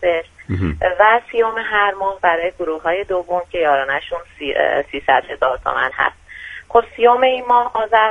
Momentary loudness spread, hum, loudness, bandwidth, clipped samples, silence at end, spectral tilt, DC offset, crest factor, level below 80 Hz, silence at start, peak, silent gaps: 9 LU; none; -17 LUFS; 9.6 kHz; under 0.1%; 0 s; -6 dB/octave; under 0.1%; 16 dB; -42 dBFS; 0 s; 0 dBFS; none